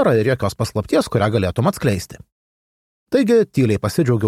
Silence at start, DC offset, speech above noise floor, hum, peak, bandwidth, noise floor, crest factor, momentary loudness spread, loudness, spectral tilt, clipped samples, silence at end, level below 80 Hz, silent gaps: 0 s; under 0.1%; over 73 dB; none; -4 dBFS; 15 kHz; under -90 dBFS; 14 dB; 6 LU; -18 LUFS; -6.5 dB/octave; under 0.1%; 0 s; -46 dBFS; 2.32-3.06 s